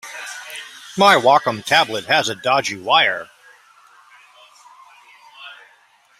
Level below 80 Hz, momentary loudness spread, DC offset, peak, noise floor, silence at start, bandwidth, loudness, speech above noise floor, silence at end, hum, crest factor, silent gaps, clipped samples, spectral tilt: -64 dBFS; 22 LU; under 0.1%; 0 dBFS; -54 dBFS; 0.05 s; 16 kHz; -16 LUFS; 38 dB; 0.65 s; none; 20 dB; none; under 0.1%; -2.5 dB/octave